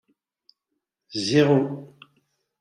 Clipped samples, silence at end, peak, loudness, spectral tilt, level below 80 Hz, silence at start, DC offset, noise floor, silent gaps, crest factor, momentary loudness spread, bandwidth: under 0.1%; 0.75 s; -6 dBFS; -22 LUFS; -6 dB/octave; -66 dBFS; 1.1 s; under 0.1%; -81 dBFS; none; 20 dB; 16 LU; 11 kHz